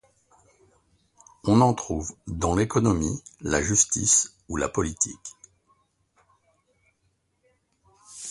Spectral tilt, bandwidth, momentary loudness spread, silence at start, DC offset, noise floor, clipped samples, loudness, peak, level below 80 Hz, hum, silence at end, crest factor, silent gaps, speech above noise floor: -4.5 dB/octave; 11.5 kHz; 15 LU; 1.45 s; under 0.1%; -71 dBFS; under 0.1%; -24 LUFS; -4 dBFS; -44 dBFS; none; 0 s; 22 dB; none; 47 dB